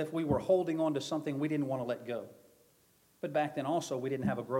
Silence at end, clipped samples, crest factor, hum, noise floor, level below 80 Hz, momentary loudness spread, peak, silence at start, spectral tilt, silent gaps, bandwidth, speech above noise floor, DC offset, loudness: 0 s; under 0.1%; 18 dB; none; -68 dBFS; -64 dBFS; 10 LU; -16 dBFS; 0 s; -6.5 dB/octave; none; 16.5 kHz; 35 dB; under 0.1%; -34 LUFS